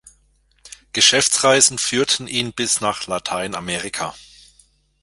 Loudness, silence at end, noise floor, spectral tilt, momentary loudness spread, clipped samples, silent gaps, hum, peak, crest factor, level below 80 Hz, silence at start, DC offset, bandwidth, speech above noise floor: -17 LUFS; 0.8 s; -60 dBFS; -1 dB/octave; 13 LU; under 0.1%; none; none; 0 dBFS; 20 dB; -54 dBFS; 0.65 s; under 0.1%; 12 kHz; 40 dB